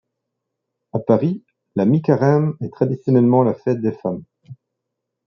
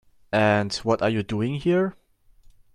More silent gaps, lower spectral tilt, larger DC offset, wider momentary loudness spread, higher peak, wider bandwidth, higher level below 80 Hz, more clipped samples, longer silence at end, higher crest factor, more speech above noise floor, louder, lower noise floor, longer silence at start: neither; first, -10.5 dB/octave vs -6 dB/octave; neither; first, 12 LU vs 6 LU; first, -2 dBFS vs -6 dBFS; second, 6.4 kHz vs 11.5 kHz; second, -64 dBFS vs -54 dBFS; neither; about the same, 0.7 s vs 0.8 s; about the same, 18 dB vs 18 dB; first, 62 dB vs 32 dB; first, -18 LUFS vs -23 LUFS; first, -79 dBFS vs -54 dBFS; first, 0.95 s vs 0.3 s